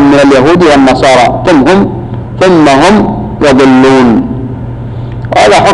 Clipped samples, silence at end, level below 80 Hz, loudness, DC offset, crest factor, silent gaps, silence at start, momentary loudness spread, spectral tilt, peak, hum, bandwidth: under 0.1%; 0 s; -28 dBFS; -5 LUFS; under 0.1%; 4 dB; none; 0 s; 15 LU; -6 dB/octave; 0 dBFS; none; 11 kHz